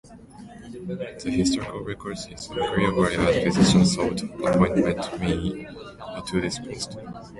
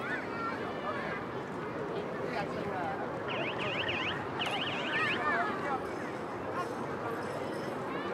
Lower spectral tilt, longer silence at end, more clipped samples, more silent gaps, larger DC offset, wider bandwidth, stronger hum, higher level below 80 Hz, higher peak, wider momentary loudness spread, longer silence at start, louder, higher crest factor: about the same, -5.5 dB/octave vs -5 dB/octave; about the same, 0 s vs 0 s; neither; neither; neither; second, 11.5 kHz vs 16 kHz; neither; first, -44 dBFS vs -66 dBFS; first, -6 dBFS vs -18 dBFS; first, 19 LU vs 7 LU; about the same, 0.05 s vs 0 s; first, -24 LUFS vs -35 LUFS; about the same, 18 dB vs 16 dB